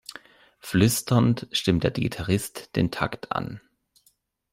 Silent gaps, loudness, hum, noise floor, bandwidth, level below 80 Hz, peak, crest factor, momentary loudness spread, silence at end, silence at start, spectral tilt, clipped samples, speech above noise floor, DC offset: none; -25 LUFS; none; -67 dBFS; 16 kHz; -50 dBFS; -6 dBFS; 20 dB; 14 LU; 0.95 s; 0.1 s; -5 dB/octave; under 0.1%; 43 dB; under 0.1%